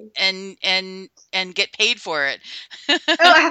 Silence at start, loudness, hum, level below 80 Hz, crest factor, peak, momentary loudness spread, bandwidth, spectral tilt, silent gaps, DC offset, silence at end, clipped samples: 0 s; -18 LUFS; none; -72 dBFS; 20 dB; 0 dBFS; 18 LU; 14.5 kHz; -1.5 dB/octave; none; under 0.1%; 0 s; under 0.1%